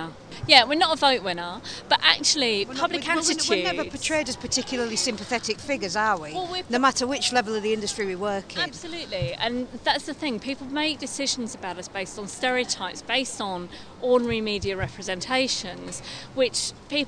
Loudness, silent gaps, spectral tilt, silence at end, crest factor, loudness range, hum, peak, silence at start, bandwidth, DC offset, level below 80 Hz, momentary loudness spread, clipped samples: -24 LUFS; none; -2 dB/octave; 0 s; 24 dB; 6 LU; none; 0 dBFS; 0 s; 11 kHz; under 0.1%; -52 dBFS; 13 LU; under 0.1%